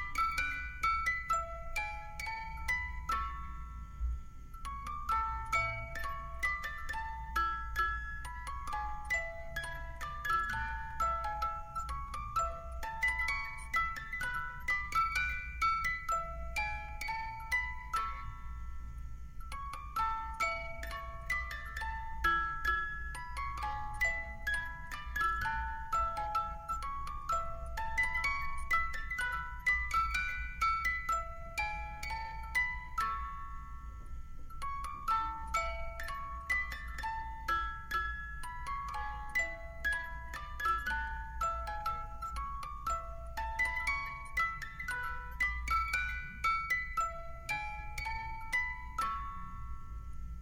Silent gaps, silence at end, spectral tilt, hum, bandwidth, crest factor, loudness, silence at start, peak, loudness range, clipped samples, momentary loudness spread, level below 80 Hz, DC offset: none; 0 s; -3 dB/octave; none; 16 kHz; 20 dB; -36 LUFS; 0 s; -18 dBFS; 5 LU; under 0.1%; 11 LU; -44 dBFS; under 0.1%